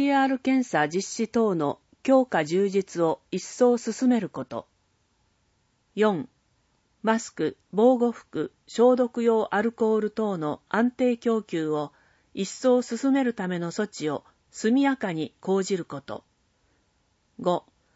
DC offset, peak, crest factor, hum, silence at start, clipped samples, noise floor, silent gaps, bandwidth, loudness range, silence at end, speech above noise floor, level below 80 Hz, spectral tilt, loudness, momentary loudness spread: under 0.1%; -8 dBFS; 18 dB; none; 0 s; under 0.1%; -69 dBFS; none; 8 kHz; 5 LU; 0.35 s; 45 dB; -70 dBFS; -5.5 dB/octave; -25 LUFS; 12 LU